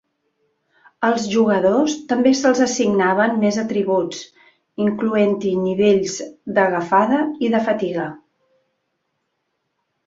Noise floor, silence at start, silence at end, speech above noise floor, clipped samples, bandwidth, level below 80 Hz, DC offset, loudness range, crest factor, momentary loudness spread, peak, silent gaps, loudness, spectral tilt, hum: -73 dBFS; 1 s; 1.9 s; 56 dB; under 0.1%; 7.8 kHz; -62 dBFS; under 0.1%; 4 LU; 16 dB; 8 LU; -2 dBFS; none; -18 LUFS; -5 dB/octave; none